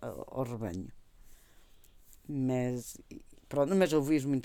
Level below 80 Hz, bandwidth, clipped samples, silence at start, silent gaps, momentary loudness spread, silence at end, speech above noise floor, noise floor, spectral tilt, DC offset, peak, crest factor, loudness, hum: -58 dBFS; 18.5 kHz; under 0.1%; 0 s; none; 22 LU; 0 s; 26 dB; -58 dBFS; -6.5 dB/octave; under 0.1%; -14 dBFS; 20 dB; -32 LUFS; none